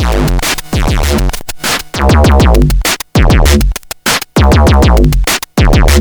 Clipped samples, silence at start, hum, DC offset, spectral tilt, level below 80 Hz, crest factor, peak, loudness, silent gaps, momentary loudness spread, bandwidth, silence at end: 0.2%; 0 s; none; under 0.1%; -5 dB/octave; -10 dBFS; 8 dB; 0 dBFS; -10 LUFS; none; 7 LU; over 20 kHz; 0 s